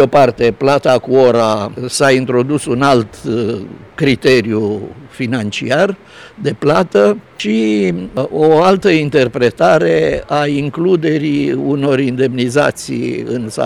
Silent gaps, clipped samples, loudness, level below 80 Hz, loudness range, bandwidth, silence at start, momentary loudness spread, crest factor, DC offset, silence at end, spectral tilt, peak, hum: none; under 0.1%; -13 LUFS; -46 dBFS; 3 LU; 13.5 kHz; 0 s; 9 LU; 12 dB; 0.2%; 0 s; -6 dB/octave; -2 dBFS; none